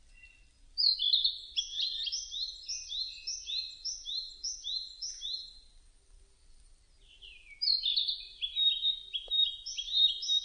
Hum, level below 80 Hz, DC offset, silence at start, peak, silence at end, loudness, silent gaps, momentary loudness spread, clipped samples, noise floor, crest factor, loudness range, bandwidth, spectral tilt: none; -62 dBFS; under 0.1%; 0.1 s; -16 dBFS; 0 s; -31 LUFS; none; 12 LU; under 0.1%; -60 dBFS; 20 dB; 10 LU; 10 kHz; 3.5 dB/octave